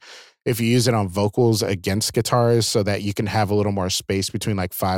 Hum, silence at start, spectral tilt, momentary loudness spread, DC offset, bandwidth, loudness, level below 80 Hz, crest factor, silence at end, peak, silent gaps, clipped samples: none; 0.05 s; -5 dB/octave; 6 LU; under 0.1%; 17 kHz; -21 LUFS; -52 dBFS; 14 dB; 0 s; -6 dBFS; none; under 0.1%